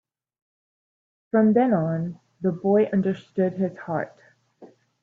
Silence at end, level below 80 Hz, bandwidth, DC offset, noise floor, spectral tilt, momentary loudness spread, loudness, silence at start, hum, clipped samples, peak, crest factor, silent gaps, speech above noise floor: 0.35 s; -68 dBFS; 4.4 kHz; under 0.1%; -51 dBFS; -10 dB/octave; 11 LU; -23 LUFS; 1.35 s; none; under 0.1%; -6 dBFS; 18 dB; none; 29 dB